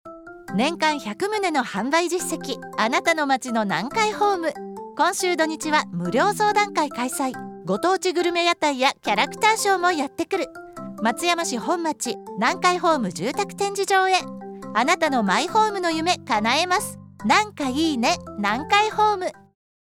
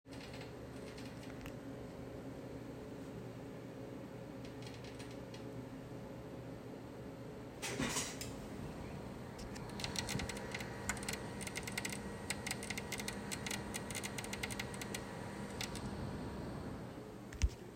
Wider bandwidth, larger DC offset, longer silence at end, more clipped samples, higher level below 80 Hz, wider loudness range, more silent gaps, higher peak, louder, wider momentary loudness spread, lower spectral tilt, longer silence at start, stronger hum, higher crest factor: first, 18 kHz vs 16 kHz; neither; first, 0.65 s vs 0 s; neither; second, -62 dBFS vs -54 dBFS; second, 2 LU vs 7 LU; neither; first, -4 dBFS vs -22 dBFS; first, -22 LUFS vs -45 LUFS; about the same, 9 LU vs 9 LU; about the same, -3 dB/octave vs -4 dB/octave; about the same, 0.05 s vs 0.05 s; neither; second, 18 dB vs 24 dB